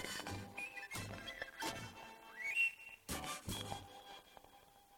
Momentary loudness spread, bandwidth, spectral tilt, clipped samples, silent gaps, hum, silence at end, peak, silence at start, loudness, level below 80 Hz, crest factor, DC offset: 20 LU; 19 kHz; -2.5 dB/octave; under 0.1%; none; none; 0 s; -26 dBFS; 0 s; -43 LUFS; -64 dBFS; 20 dB; under 0.1%